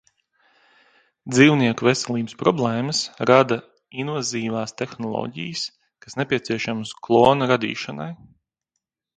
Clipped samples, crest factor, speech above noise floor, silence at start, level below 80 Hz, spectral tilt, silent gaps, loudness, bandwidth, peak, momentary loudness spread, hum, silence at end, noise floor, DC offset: under 0.1%; 22 dB; 60 dB; 1.25 s; -60 dBFS; -5 dB/octave; none; -21 LUFS; 9.6 kHz; 0 dBFS; 15 LU; none; 1.05 s; -81 dBFS; under 0.1%